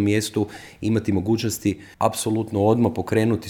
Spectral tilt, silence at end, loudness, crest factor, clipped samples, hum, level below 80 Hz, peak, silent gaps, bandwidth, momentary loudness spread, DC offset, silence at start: -6 dB/octave; 0 s; -23 LUFS; 18 dB; under 0.1%; none; -54 dBFS; -4 dBFS; none; 19 kHz; 7 LU; under 0.1%; 0 s